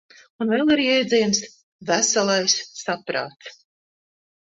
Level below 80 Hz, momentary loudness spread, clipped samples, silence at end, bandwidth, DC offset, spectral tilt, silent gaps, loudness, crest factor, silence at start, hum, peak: -64 dBFS; 17 LU; under 0.1%; 1 s; 8.2 kHz; under 0.1%; -2.5 dB/octave; 1.63-1.79 s; -21 LUFS; 18 dB; 0.4 s; none; -4 dBFS